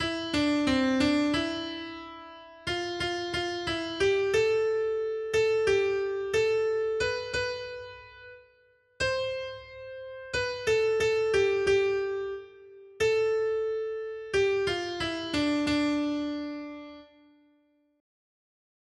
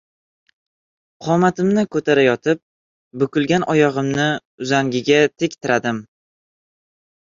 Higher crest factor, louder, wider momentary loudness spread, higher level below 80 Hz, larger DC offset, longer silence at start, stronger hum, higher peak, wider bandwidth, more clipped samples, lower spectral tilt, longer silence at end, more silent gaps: about the same, 16 dB vs 18 dB; second, -28 LUFS vs -18 LUFS; first, 17 LU vs 9 LU; about the same, -56 dBFS vs -58 dBFS; neither; second, 0 s vs 1.2 s; neither; second, -14 dBFS vs -2 dBFS; first, 11.5 kHz vs 7.6 kHz; neither; about the same, -4.5 dB/octave vs -5.5 dB/octave; first, 1.95 s vs 1.2 s; second, none vs 2.62-3.11 s, 4.45-4.58 s